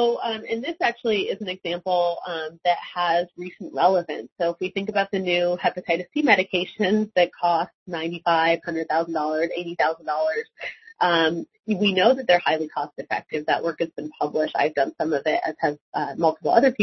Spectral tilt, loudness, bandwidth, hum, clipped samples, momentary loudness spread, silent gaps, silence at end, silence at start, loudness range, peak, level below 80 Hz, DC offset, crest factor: -5.5 dB/octave; -23 LUFS; 6.2 kHz; none; under 0.1%; 10 LU; 4.32-4.36 s, 7.74-7.86 s, 11.59-11.63 s, 15.81-15.92 s; 0 s; 0 s; 3 LU; -2 dBFS; -68 dBFS; under 0.1%; 22 dB